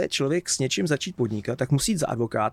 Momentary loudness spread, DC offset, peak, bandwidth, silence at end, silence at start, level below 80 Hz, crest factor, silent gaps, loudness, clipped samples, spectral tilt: 4 LU; under 0.1%; -10 dBFS; 16 kHz; 0 s; 0 s; -52 dBFS; 14 dB; none; -25 LUFS; under 0.1%; -4.5 dB/octave